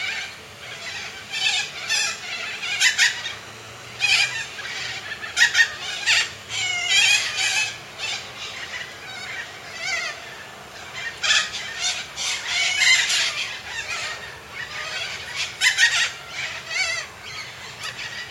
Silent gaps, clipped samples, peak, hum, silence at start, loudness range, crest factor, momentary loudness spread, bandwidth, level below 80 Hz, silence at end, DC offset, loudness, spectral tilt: none; under 0.1%; -4 dBFS; none; 0 s; 6 LU; 22 dB; 17 LU; 16.5 kHz; -60 dBFS; 0 s; under 0.1%; -21 LUFS; 1.5 dB/octave